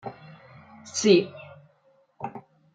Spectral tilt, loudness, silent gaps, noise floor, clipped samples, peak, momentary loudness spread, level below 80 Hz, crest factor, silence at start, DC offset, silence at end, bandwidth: -4.5 dB/octave; -22 LUFS; none; -63 dBFS; under 0.1%; -6 dBFS; 26 LU; -76 dBFS; 22 dB; 0.05 s; under 0.1%; 0.35 s; 9.4 kHz